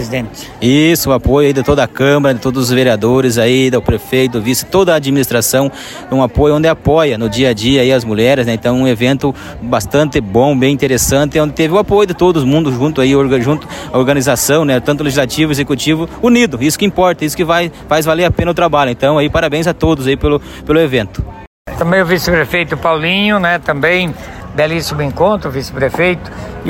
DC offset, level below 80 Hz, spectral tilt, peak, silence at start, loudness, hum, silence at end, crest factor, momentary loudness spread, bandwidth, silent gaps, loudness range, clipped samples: under 0.1%; -32 dBFS; -5 dB/octave; 0 dBFS; 0 s; -12 LUFS; none; 0 s; 12 dB; 7 LU; 16.5 kHz; 21.47-21.65 s; 2 LU; under 0.1%